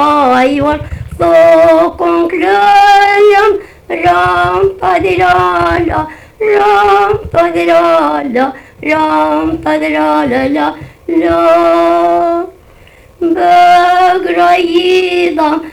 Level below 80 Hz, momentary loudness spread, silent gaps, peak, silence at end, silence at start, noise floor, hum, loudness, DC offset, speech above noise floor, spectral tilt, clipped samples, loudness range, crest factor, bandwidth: -36 dBFS; 9 LU; none; 0 dBFS; 0 s; 0 s; -39 dBFS; none; -9 LUFS; under 0.1%; 30 dB; -5.5 dB/octave; under 0.1%; 4 LU; 10 dB; 14.5 kHz